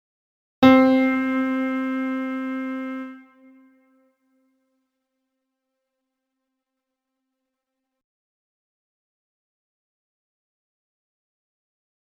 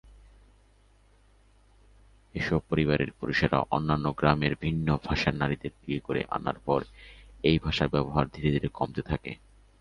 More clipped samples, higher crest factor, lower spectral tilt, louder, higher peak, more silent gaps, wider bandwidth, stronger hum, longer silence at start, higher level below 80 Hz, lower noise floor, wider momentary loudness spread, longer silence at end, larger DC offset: neither; about the same, 26 dB vs 24 dB; about the same, -6.5 dB/octave vs -7.5 dB/octave; first, -21 LUFS vs -28 LUFS; first, -2 dBFS vs -6 dBFS; neither; second, 6.6 kHz vs 9.8 kHz; neither; second, 0.6 s vs 2.35 s; second, -66 dBFS vs -44 dBFS; first, -83 dBFS vs -61 dBFS; first, 16 LU vs 9 LU; first, 8.85 s vs 0.45 s; neither